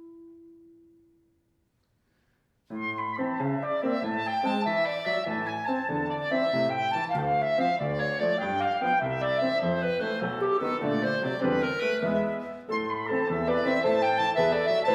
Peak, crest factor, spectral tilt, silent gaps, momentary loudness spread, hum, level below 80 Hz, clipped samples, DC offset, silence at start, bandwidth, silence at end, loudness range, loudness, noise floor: -12 dBFS; 14 dB; -6.5 dB/octave; none; 6 LU; none; -62 dBFS; under 0.1%; under 0.1%; 0 s; 9.8 kHz; 0 s; 6 LU; -27 LUFS; -71 dBFS